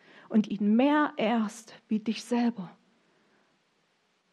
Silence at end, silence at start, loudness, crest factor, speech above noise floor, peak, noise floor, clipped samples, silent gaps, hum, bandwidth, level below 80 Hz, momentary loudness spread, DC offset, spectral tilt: 1.65 s; 0.3 s; -28 LUFS; 18 dB; 44 dB; -12 dBFS; -72 dBFS; under 0.1%; none; none; 11.5 kHz; -80 dBFS; 15 LU; under 0.1%; -6 dB/octave